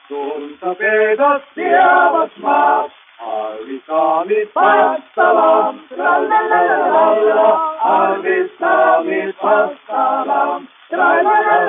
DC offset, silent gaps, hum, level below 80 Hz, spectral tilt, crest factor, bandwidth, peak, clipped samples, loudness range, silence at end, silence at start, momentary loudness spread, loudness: under 0.1%; none; none; -72 dBFS; -8 dB/octave; 14 dB; 3.8 kHz; 0 dBFS; under 0.1%; 2 LU; 0 s; 0.1 s; 12 LU; -14 LUFS